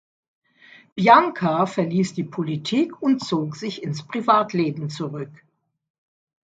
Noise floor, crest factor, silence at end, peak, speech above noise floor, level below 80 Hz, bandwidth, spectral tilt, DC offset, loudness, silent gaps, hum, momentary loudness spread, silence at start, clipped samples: -51 dBFS; 22 dB; 1.2 s; 0 dBFS; 30 dB; -70 dBFS; 9 kHz; -6.5 dB/octave; under 0.1%; -21 LUFS; none; none; 15 LU; 0.95 s; under 0.1%